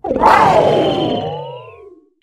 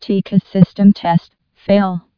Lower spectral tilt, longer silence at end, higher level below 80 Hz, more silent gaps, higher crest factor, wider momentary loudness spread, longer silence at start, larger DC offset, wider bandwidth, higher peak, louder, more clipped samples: second, -6 dB/octave vs -10 dB/octave; first, 0.5 s vs 0.2 s; first, -42 dBFS vs -50 dBFS; neither; about the same, 14 dB vs 14 dB; first, 20 LU vs 7 LU; about the same, 0.05 s vs 0 s; neither; first, 14.5 kHz vs 5.4 kHz; about the same, 0 dBFS vs 0 dBFS; about the same, -12 LUFS vs -14 LUFS; second, under 0.1% vs 0.4%